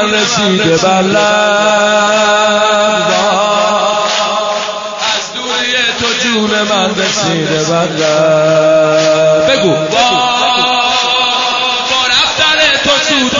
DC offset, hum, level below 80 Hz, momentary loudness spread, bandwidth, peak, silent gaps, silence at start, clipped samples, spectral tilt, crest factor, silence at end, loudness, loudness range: under 0.1%; none; -46 dBFS; 4 LU; 7.6 kHz; 0 dBFS; none; 0 s; under 0.1%; -3 dB/octave; 10 dB; 0 s; -10 LUFS; 3 LU